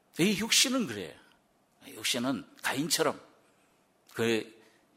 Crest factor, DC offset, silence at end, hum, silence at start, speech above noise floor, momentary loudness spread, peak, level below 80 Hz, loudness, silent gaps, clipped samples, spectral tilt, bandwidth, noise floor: 20 dB; under 0.1%; 0.45 s; none; 0.15 s; 38 dB; 21 LU; -12 dBFS; -72 dBFS; -29 LUFS; none; under 0.1%; -2.5 dB/octave; 16 kHz; -68 dBFS